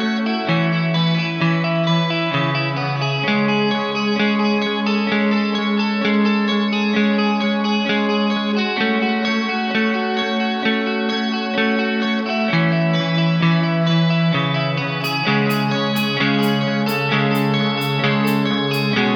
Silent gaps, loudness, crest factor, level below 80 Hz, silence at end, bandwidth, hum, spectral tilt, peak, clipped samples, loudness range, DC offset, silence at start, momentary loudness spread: none; -18 LUFS; 14 dB; -64 dBFS; 0 s; over 20 kHz; none; -6.5 dB/octave; -4 dBFS; under 0.1%; 1 LU; under 0.1%; 0 s; 3 LU